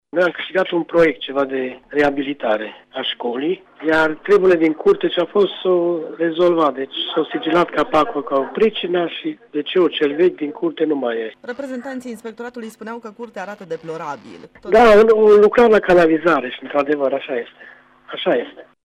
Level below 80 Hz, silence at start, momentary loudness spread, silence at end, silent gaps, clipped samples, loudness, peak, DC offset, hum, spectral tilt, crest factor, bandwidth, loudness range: -50 dBFS; 0.15 s; 18 LU; 0.2 s; none; under 0.1%; -17 LUFS; -4 dBFS; under 0.1%; none; -6 dB/octave; 14 dB; 10 kHz; 10 LU